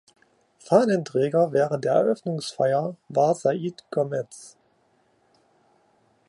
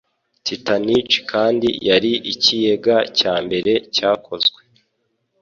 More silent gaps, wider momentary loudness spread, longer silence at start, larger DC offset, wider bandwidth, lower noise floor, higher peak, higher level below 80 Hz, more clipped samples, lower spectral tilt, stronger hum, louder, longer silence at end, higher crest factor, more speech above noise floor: neither; first, 9 LU vs 4 LU; first, 0.7 s vs 0.45 s; neither; first, 11.5 kHz vs 7.4 kHz; second, -65 dBFS vs -70 dBFS; about the same, -4 dBFS vs -2 dBFS; second, -76 dBFS vs -56 dBFS; neither; first, -6.5 dB/octave vs -4 dB/octave; neither; second, -24 LUFS vs -17 LUFS; first, 1.8 s vs 0.95 s; about the same, 20 dB vs 18 dB; second, 42 dB vs 52 dB